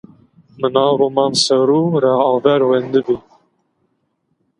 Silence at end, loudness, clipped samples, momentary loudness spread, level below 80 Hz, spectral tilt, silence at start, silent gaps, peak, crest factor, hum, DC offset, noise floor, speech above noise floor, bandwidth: 1.4 s; -15 LUFS; under 0.1%; 6 LU; -60 dBFS; -5 dB/octave; 0.6 s; none; 0 dBFS; 16 dB; none; under 0.1%; -67 dBFS; 53 dB; 11 kHz